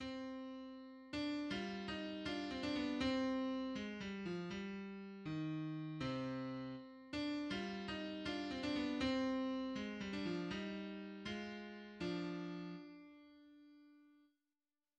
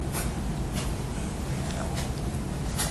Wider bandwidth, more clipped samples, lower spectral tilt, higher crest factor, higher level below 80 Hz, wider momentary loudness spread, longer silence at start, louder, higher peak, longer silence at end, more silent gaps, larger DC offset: second, 9.4 kHz vs 14 kHz; neither; about the same, -6 dB/octave vs -5 dB/octave; about the same, 18 dB vs 16 dB; second, -68 dBFS vs -36 dBFS; first, 13 LU vs 2 LU; about the same, 0 s vs 0 s; second, -44 LUFS vs -31 LUFS; second, -26 dBFS vs -14 dBFS; first, 0.85 s vs 0 s; neither; neither